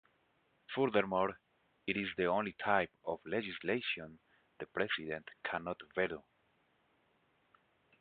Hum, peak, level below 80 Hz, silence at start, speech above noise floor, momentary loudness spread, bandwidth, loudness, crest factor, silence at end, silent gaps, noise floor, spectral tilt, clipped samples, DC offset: none; -14 dBFS; -72 dBFS; 0.7 s; 38 dB; 11 LU; 4.8 kHz; -37 LUFS; 24 dB; 1.8 s; none; -75 dBFS; -2.5 dB/octave; under 0.1%; under 0.1%